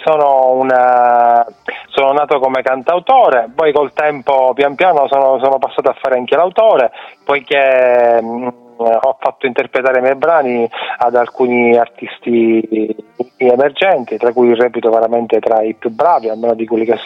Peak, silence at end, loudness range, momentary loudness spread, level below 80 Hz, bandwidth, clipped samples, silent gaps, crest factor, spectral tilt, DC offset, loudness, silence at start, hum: 0 dBFS; 0 s; 2 LU; 8 LU; -62 dBFS; 6.2 kHz; under 0.1%; none; 12 dB; -6.5 dB/octave; under 0.1%; -12 LUFS; 0 s; none